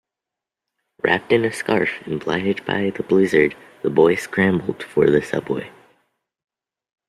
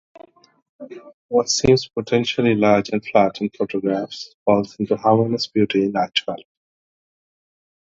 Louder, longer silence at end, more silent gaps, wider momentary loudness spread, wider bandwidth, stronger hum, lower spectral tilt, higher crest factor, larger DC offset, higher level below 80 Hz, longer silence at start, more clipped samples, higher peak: about the same, -20 LUFS vs -19 LUFS; about the same, 1.4 s vs 1.5 s; second, none vs 1.14-1.29 s, 4.34-4.46 s; about the same, 9 LU vs 11 LU; first, 13 kHz vs 8 kHz; neither; about the same, -6 dB/octave vs -5 dB/octave; about the same, 18 dB vs 20 dB; neither; second, -56 dBFS vs -50 dBFS; first, 1.05 s vs 0.8 s; neither; about the same, -2 dBFS vs 0 dBFS